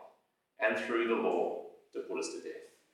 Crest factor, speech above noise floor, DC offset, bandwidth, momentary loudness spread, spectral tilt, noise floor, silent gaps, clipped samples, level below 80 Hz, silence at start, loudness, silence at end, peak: 20 dB; 37 dB; under 0.1%; 12 kHz; 15 LU; -3.5 dB/octave; -71 dBFS; none; under 0.1%; under -90 dBFS; 0 s; -34 LUFS; 0.25 s; -16 dBFS